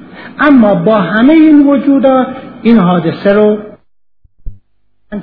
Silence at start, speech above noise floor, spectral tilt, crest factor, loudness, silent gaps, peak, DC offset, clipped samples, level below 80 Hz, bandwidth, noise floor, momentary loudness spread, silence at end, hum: 0 s; 49 dB; -10.5 dB/octave; 10 dB; -8 LUFS; none; 0 dBFS; under 0.1%; 0.6%; -38 dBFS; 4.9 kHz; -56 dBFS; 11 LU; 0 s; none